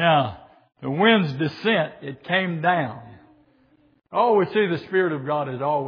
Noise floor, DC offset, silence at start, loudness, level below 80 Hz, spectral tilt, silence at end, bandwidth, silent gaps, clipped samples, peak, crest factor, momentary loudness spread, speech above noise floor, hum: -59 dBFS; under 0.1%; 0 s; -22 LUFS; -66 dBFS; -8 dB/octave; 0 s; 5.4 kHz; none; under 0.1%; -6 dBFS; 18 dB; 12 LU; 38 dB; none